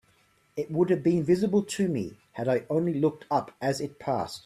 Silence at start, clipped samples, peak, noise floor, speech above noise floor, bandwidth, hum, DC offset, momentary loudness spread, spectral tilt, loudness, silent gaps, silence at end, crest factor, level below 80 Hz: 0.55 s; under 0.1%; -12 dBFS; -65 dBFS; 38 dB; 14 kHz; none; under 0.1%; 9 LU; -6.5 dB/octave; -27 LUFS; none; 0.05 s; 16 dB; -64 dBFS